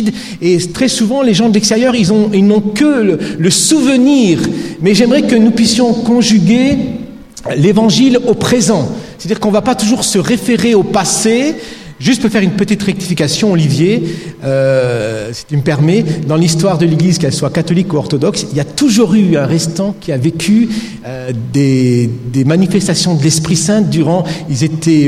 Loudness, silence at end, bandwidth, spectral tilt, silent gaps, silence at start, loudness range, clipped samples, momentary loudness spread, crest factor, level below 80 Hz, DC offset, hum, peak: -11 LUFS; 0 s; 15 kHz; -5 dB/octave; none; 0 s; 3 LU; under 0.1%; 9 LU; 10 dB; -44 dBFS; under 0.1%; none; 0 dBFS